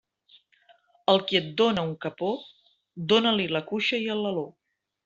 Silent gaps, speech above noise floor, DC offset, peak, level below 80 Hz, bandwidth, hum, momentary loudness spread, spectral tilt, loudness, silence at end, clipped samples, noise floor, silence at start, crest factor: none; 36 dB; under 0.1%; -6 dBFS; -68 dBFS; 7.8 kHz; none; 11 LU; -5.5 dB/octave; -26 LUFS; 0.55 s; under 0.1%; -61 dBFS; 1.1 s; 22 dB